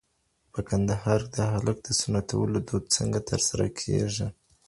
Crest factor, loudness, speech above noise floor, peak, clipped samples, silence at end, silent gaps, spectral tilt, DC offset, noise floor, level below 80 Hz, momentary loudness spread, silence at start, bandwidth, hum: 20 dB; -27 LUFS; 45 dB; -8 dBFS; under 0.1%; 0.35 s; none; -4.5 dB/octave; under 0.1%; -72 dBFS; -46 dBFS; 5 LU; 0.55 s; 11.5 kHz; none